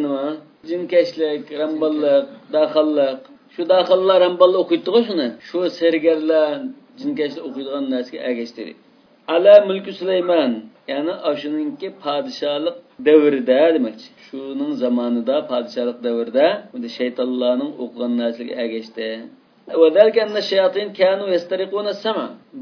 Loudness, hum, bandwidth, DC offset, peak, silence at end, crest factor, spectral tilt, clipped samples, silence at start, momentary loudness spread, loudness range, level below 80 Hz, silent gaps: -19 LUFS; none; 5.4 kHz; under 0.1%; 0 dBFS; 0 s; 18 dB; -6 dB/octave; under 0.1%; 0 s; 14 LU; 5 LU; -76 dBFS; none